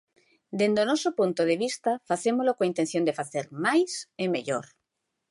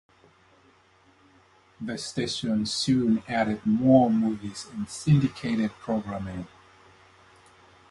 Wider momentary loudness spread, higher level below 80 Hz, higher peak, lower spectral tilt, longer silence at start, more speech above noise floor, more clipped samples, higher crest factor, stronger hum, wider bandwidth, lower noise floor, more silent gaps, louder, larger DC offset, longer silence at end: second, 8 LU vs 16 LU; second, -76 dBFS vs -56 dBFS; about the same, -10 dBFS vs -8 dBFS; second, -4.5 dB/octave vs -6 dB/octave; second, 0.5 s vs 1.8 s; first, 55 dB vs 35 dB; neither; about the same, 16 dB vs 20 dB; neither; about the same, 11.5 kHz vs 11.5 kHz; first, -82 dBFS vs -60 dBFS; neither; about the same, -27 LUFS vs -26 LUFS; neither; second, 0.7 s vs 1.45 s